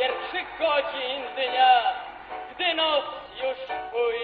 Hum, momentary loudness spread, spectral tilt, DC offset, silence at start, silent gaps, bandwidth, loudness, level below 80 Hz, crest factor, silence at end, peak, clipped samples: none; 16 LU; 2.5 dB/octave; under 0.1%; 0 s; none; 4.9 kHz; -25 LUFS; -62 dBFS; 18 dB; 0 s; -8 dBFS; under 0.1%